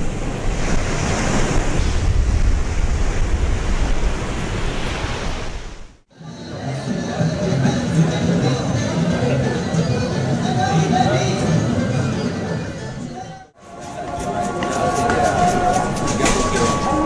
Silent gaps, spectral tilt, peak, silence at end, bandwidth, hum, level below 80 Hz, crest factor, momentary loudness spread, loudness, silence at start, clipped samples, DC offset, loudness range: none; -5.5 dB/octave; -4 dBFS; 0 s; 11 kHz; none; -24 dBFS; 14 dB; 12 LU; -20 LUFS; 0 s; under 0.1%; under 0.1%; 6 LU